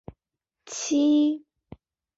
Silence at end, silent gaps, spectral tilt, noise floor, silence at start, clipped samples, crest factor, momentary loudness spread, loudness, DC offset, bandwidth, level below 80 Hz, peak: 0.8 s; none; -3.5 dB/octave; -86 dBFS; 0.65 s; under 0.1%; 14 dB; 15 LU; -24 LUFS; under 0.1%; 8 kHz; -62 dBFS; -14 dBFS